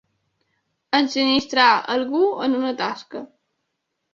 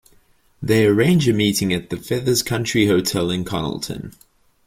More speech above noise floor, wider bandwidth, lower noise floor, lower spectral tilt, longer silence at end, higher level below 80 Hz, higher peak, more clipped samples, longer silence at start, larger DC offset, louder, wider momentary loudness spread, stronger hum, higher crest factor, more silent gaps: first, 57 dB vs 37 dB; second, 7.4 kHz vs 16.5 kHz; first, -77 dBFS vs -56 dBFS; second, -3.5 dB/octave vs -5 dB/octave; first, 0.85 s vs 0.55 s; second, -64 dBFS vs -48 dBFS; about the same, -2 dBFS vs -4 dBFS; neither; first, 0.9 s vs 0.6 s; neither; about the same, -19 LUFS vs -19 LUFS; about the same, 14 LU vs 13 LU; neither; about the same, 20 dB vs 16 dB; neither